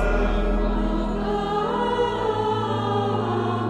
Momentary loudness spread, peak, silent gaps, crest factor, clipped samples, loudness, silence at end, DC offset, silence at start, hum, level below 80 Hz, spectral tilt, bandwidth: 2 LU; -10 dBFS; none; 12 dB; under 0.1%; -24 LUFS; 0 s; under 0.1%; 0 s; none; -28 dBFS; -7 dB/octave; 8.8 kHz